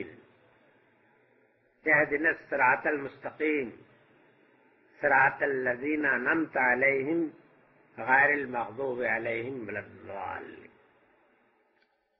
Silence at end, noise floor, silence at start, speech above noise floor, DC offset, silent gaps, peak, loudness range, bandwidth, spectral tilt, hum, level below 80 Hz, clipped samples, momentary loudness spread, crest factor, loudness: 1.55 s; -71 dBFS; 0 s; 43 dB; under 0.1%; none; -10 dBFS; 4 LU; 5.8 kHz; -4 dB/octave; none; -70 dBFS; under 0.1%; 16 LU; 20 dB; -28 LUFS